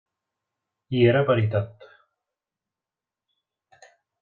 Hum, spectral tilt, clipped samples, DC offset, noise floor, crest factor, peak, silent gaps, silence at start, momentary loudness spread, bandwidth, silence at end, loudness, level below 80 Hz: none; -9 dB/octave; under 0.1%; under 0.1%; -90 dBFS; 22 dB; -6 dBFS; none; 0.9 s; 11 LU; 7 kHz; 2.5 s; -22 LUFS; -62 dBFS